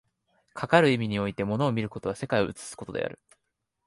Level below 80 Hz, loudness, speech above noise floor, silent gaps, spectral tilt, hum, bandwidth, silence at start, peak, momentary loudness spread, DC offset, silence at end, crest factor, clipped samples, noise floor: -58 dBFS; -27 LUFS; 54 dB; none; -6 dB/octave; none; 11.5 kHz; 0.55 s; -4 dBFS; 15 LU; under 0.1%; 0.7 s; 24 dB; under 0.1%; -80 dBFS